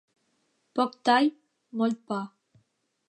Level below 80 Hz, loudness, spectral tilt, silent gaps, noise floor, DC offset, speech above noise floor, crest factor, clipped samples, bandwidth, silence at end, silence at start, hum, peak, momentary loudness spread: -86 dBFS; -27 LUFS; -5 dB/octave; none; -73 dBFS; under 0.1%; 47 dB; 20 dB; under 0.1%; 11 kHz; 0.8 s; 0.75 s; none; -10 dBFS; 14 LU